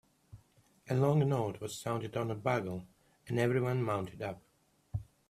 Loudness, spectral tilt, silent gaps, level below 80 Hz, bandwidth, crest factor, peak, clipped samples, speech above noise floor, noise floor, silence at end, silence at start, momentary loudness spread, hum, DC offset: -34 LUFS; -7 dB/octave; none; -62 dBFS; 14.5 kHz; 20 dB; -16 dBFS; under 0.1%; 34 dB; -67 dBFS; 0.25 s; 0.35 s; 14 LU; none; under 0.1%